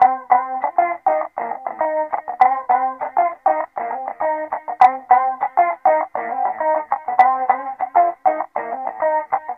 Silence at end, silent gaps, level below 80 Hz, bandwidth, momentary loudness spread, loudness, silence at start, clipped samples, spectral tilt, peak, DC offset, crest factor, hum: 0 s; none; -70 dBFS; 5.2 kHz; 10 LU; -19 LUFS; 0 s; under 0.1%; -5.5 dB/octave; 0 dBFS; under 0.1%; 18 dB; none